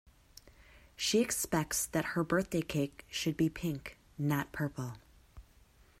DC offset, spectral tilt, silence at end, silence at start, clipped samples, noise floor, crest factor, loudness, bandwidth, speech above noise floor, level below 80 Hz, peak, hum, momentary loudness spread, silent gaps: under 0.1%; -4.5 dB/octave; 0.6 s; 0.45 s; under 0.1%; -63 dBFS; 18 dB; -34 LUFS; 16 kHz; 29 dB; -58 dBFS; -16 dBFS; none; 12 LU; none